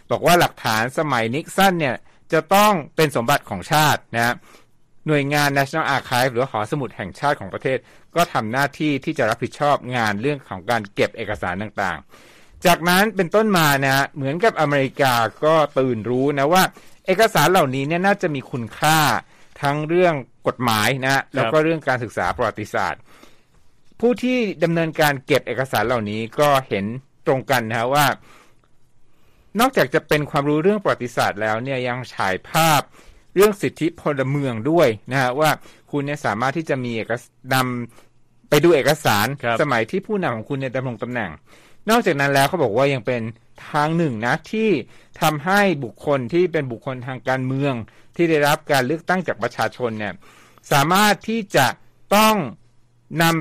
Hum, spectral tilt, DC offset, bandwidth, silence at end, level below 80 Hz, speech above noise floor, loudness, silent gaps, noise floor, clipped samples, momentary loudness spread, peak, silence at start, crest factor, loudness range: none; -5 dB/octave; under 0.1%; 15.5 kHz; 0 s; -52 dBFS; 32 dB; -20 LUFS; none; -52 dBFS; under 0.1%; 10 LU; -4 dBFS; 0.1 s; 16 dB; 4 LU